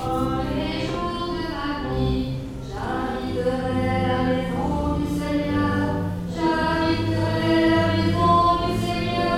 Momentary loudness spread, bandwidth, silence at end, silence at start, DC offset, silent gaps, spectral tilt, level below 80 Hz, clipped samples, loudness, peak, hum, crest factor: 9 LU; 15.5 kHz; 0 s; 0 s; under 0.1%; none; -7 dB/octave; -36 dBFS; under 0.1%; -23 LUFS; -6 dBFS; none; 16 dB